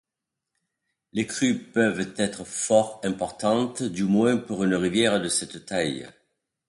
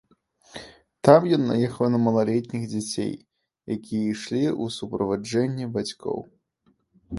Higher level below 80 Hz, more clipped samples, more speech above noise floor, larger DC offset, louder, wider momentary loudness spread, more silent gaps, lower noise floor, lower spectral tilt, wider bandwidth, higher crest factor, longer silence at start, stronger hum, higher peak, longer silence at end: about the same, -60 dBFS vs -58 dBFS; neither; first, 61 dB vs 44 dB; neither; about the same, -25 LUFS vs -24 LUFS; second, 8 LU vs 16 LU; neither; first, -86 dBFS vs -67 dBFS; second, -4.5 dB/octave vs -6.5 dB/octave; about the same, 11.5 kHz vs 11.5 kHz; about the same, 20 dB vs 24 dB; first, 1.15 s vs 0.55 s; neither; second, -6 dBFS vs 0 dBFS; first, 0.6 s vs 0 s